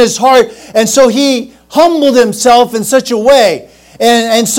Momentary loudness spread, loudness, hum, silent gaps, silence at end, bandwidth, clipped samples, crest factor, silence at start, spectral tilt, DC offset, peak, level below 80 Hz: 6 LU; -9 LUFS; none; none; 0 s; 17.5 kHz; 4%; 8 dB; 0 s; -3 dB/octave; under 0.1%; 0 dBFS; -44 dBFS